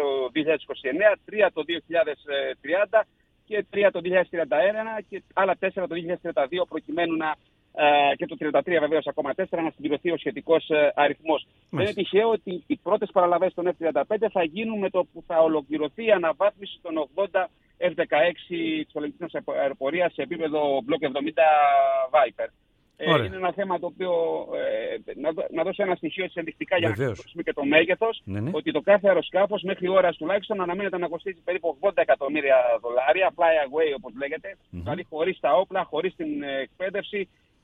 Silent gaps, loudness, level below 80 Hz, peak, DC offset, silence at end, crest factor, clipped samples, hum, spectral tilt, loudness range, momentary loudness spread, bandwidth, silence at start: none; -25 LUFS; -62 dBFS; -4 dBFS; under 0.1%; 0.4 s; 20 dB; under 0.1%; none; -7 dB/octave; 4 LU; 10 LU; 4.5 kHz; 0 s